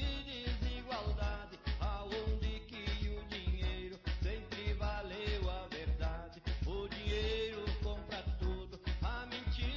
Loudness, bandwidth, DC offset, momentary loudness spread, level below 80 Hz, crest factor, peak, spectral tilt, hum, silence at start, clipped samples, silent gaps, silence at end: -40 LUFS; 7.2 kHz; under 0.1%; 4 LU; -40 dBFS; 12 dB; -26 dBFS; -6.5 dB/octave; none; 0 s; under 0.1%; none; 0 s